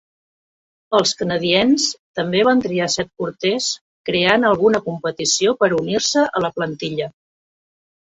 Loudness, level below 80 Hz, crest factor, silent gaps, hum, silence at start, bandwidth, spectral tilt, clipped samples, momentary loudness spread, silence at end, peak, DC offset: -18 LUFS; -58 dBFS; 18 dB; 1.99-2.14 s, 3.81-4.04 s; none; 0.9 s; 8.4 kHz; -3.5 dB/octave; under 0.1%; 10 LU; 1 s; -2 dBFS; under 0.1%